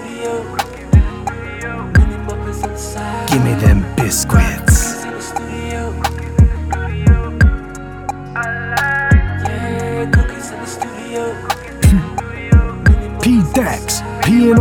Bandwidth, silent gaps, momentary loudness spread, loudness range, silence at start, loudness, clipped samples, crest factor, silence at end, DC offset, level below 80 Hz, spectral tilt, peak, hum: 18 kHz; none; 11 LU; 2 LU; 0 s; -16 LUFS; under 0.1%; 14 dB; 0 s; under 0.1%; -20 dBFS; -5.5 dB/octave; 0 dBFS; none